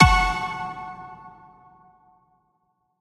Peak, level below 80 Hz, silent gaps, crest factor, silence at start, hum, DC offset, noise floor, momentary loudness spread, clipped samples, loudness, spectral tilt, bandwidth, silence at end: 0 dBFS; -34 dBFS; none; 24 dB; 0 s; none; under 0.1%; -71 dBFS; 25 LU; under 0.1%; -23 LUFS; -4.5 dB/octave; 14 kHz; 1.7 s